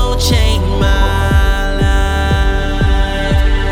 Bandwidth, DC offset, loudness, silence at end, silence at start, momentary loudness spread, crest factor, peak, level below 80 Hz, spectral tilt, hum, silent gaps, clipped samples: 16 kHz; under 0.1%; -14 LUFS; 0 s; 0 s; 3 LU; 10 dB; -2 dBFS; -14 dBFS; -5.5 dB/octave; none; none; under 0.1%